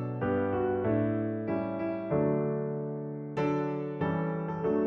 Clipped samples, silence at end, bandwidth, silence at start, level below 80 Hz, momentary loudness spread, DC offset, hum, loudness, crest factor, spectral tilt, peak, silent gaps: under 0.1%; 0 s; 6.4 kHz; 0 s; -60 dBFS; 5 LU; under 0.1%; none; -31 LUFS; 12 dB; -10 dB/octave; -18 dBFS; none